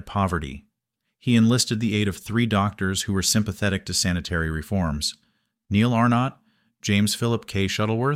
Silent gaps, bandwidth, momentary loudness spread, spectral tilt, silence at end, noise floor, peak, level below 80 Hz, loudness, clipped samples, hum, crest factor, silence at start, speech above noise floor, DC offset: none; 16 kHz; 8 LU; -4.5 dB/octave; 0 s; -80 dBFS; -8 dBFS; -44 dBFS; -23 LUFS; under 0.1%; none; 16 dB; 0.05 s; 57 dB; under 0.1%